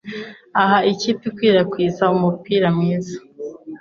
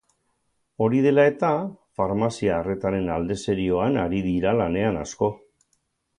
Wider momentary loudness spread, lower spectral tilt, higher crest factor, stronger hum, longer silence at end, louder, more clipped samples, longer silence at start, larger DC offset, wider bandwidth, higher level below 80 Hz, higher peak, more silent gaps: first, 16 LU vs 8 LU; about the same, -6.5 dB/octave vs -7 dB/octave; about the same, 16 dB vs 18 dB; neither; second, 0.05 s vs 0.8 s; first, -18 LUFS vs -23 LUFS; neither; second, 0.05 s vs 0.8 s; neither; second, 7.2 kHz vs 10.5 kHz; second, -58 dBFS vs -48 dBFS; first, -2 dBFS vs -6 dBFS; neither